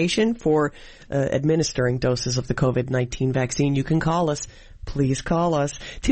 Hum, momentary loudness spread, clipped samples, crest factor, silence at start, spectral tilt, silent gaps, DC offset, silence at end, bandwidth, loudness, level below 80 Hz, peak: none; 7 LU; under 0.1%; 14 dB; 0 s; -5.5 dB/octave; none; under 0.1%; 0 s; 8.8 kHz; -23 LUFS; -40 dBFS; -8 dBFS